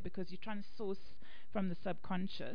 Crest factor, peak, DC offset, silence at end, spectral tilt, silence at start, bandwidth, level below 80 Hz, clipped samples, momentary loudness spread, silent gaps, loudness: 18 dB; -22 dBFS; 2%; 0 s; -5.5 dB/octave; 0 s; 5.2 kHz; -64 dBFS; under 0.1%; 8 LU; none; -43 LUFS